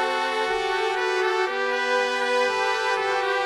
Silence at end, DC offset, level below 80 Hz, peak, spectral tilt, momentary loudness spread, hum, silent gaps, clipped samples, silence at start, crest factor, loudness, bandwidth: 0 s; under 0.1%; -60 dBFS; -8 dBFS; -1.5 dB/octave; 2 LU; none; none; under 0.1%; 0 s; 14 dB; -23 LUFS; 13.5 kHz